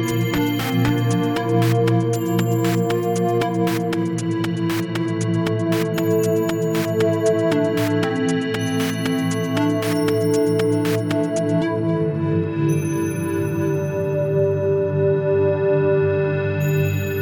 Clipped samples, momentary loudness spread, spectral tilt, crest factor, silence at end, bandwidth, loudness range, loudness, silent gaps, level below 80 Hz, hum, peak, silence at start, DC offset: under 0.1%; 4 LU; -6.5 dB/octave; 14 dB; 0 s; 18 kHz; 2 LU; -20 LUFS; none; -52 dBFS; none; -6 dBFS; 0 s; under 0.1%